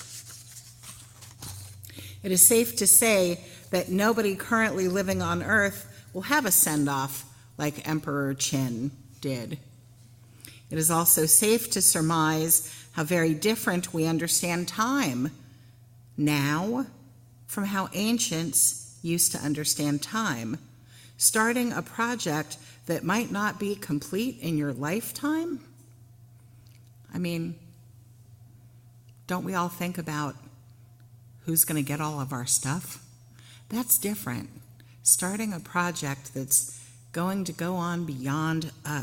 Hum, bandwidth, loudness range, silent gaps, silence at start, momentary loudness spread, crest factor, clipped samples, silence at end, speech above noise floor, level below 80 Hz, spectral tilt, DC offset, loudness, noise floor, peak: none; 17 kHz; 12 LU; none; 0 s; 19 LU; 26 dB; under 0.1%; 0 s; 26 dB; -64 dBFS; -3.5 dB/octave; under 0.1%; -25 LUFS; -53 dBFS; -2 dBFS